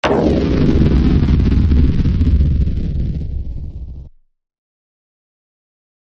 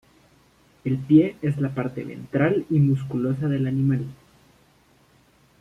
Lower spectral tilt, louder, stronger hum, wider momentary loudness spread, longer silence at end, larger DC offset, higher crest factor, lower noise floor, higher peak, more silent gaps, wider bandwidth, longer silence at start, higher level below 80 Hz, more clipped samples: about the same, -9 dB/octave vs -10 dB/octave; first, -15 LUFS vs -23 LUFS; neither; first, 15 LU vs 12 LU; first, 1.95 s vs 1.45 s; neither; second, 14 dB vs 20 dB; second, -37 dBFS vs -58 dBFS; about the same, -2 dBFS vs -4 dBFS; neither; first, 6.6 kHz vs 4.9 kHz; second, 0.05 s vs 0.85 s; first, -18 dBFS vs -58 dBFS; neither